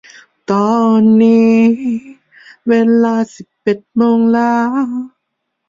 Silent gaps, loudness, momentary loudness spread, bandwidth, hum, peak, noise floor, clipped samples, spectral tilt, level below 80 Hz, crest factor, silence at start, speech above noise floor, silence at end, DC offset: none; -13 LUFS; 15 LU; 7.4 kHz; none; -2 dBFS; -72 dBFS; under 0.1%; -7.5 dB/octave; -60 dBFS; 12 dB; 0.5 s; 61 dB; 0.6 s; under 0.1%